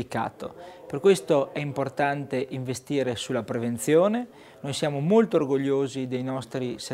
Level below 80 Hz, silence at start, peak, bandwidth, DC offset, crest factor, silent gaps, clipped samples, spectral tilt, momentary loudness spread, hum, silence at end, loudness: -64 dBFS; 0 s; -8 dBFS; 16 kHz; under 0.1%; 18 dB; none; under 0.1%; -5.5 dB/octave; 12 LU; none; 0 s; -26 LUFS